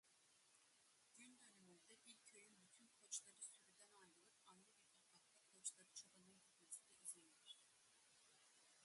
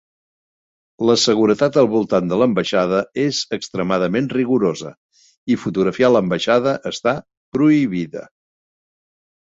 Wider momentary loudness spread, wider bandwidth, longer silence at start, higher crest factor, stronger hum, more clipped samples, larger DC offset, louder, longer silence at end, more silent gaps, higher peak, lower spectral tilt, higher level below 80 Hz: first, 15 LU vs 10 LU; first, 11.5 kHz vs 8 kHz; second, 0.05 s vs 1 s; first, 28 dB vs 16 dB; neither; neither; neither; second, -59 LUFS vs -18 LUFS; second, 0 s vs 1.25 s; second, none vs 4.97-5.09 s, 5.37-5.47 s, 7.37-7.52 s; second, -36 dBFS vs -2 dBFS; second, 0 dB/octave vs -5.5 dB/octave; second, under -90 dBFS vs -56 dBFS